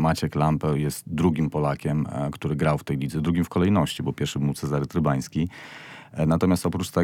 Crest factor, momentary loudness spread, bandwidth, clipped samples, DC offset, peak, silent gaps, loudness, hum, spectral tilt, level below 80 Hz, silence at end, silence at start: 16 dB; 7 LU; 16.5 kHz; under 0.1%; under 0.1%; -8 dBFS; none; -25 LUFS; none; -6.5 dB/octave; -46 dBFS; 0 s; 0 s